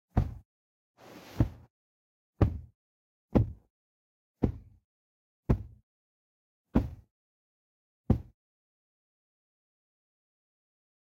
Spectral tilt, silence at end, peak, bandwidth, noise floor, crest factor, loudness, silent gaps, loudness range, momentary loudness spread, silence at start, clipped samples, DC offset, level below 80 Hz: -10 dB/octave; 2.8 s; -10 dBFS; 7.2 kHz; under -90 dBFS; 26 dB; -32 LUFS; 0.45-0.94 s, 1.70-2.33 s, 2.75-3.29 s, 3.70-4.34 s, 4.84-5.43 s, 5.83-6.65 s, 7.11-8.04 s; 6 LU; 22 LU; 0.15 s; under 0.1%; under 0.1%; -42 dBFS